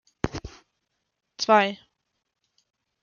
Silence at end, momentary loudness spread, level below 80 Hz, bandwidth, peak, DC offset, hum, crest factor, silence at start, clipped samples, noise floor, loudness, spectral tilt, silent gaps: 1.3 s; 23 LU; -50 dBFS; 7.2 kHz; -6 dBFS; under 0.1%; none; 22 dB; 0.25 s; under 0.1%; -79 dBFS; -24 LUFS; -4 dB/octave; none